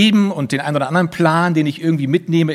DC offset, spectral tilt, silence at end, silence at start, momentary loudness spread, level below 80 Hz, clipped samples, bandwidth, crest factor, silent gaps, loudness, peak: under 0.1%; -6.5 dB/octave; 0 s; 0 s; 5 LU; -60 dBFS; under 0.1%; 13 kHz; 16 dB; none; -16 LUFS; 0 dBFS